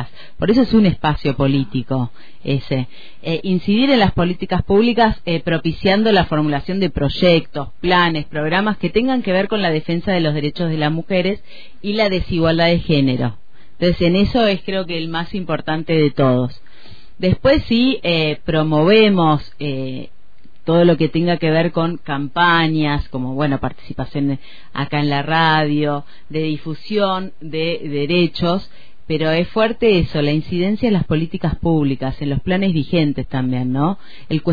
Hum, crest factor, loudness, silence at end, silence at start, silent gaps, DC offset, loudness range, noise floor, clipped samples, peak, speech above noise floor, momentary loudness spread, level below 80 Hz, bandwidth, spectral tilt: none; 14 dB; -17 LUFS; 0 s; 0 s; none; 4%; 3 LU; -52 dBFS; under 0.1%; -2 dBFS; 35 dB; 10 LU; -36 dBFS; 5 kHz; -8.5 dB/octave